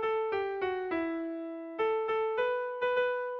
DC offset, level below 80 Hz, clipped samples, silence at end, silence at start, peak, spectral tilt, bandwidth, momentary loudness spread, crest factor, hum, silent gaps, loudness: under 0.1%; -68 dBFS; under 0.1%; 0 s; 0 s; -20 dBFS; -6 dB/octave; 6 kHz; 7 LU; 12 dB; none; none; -32 LUFS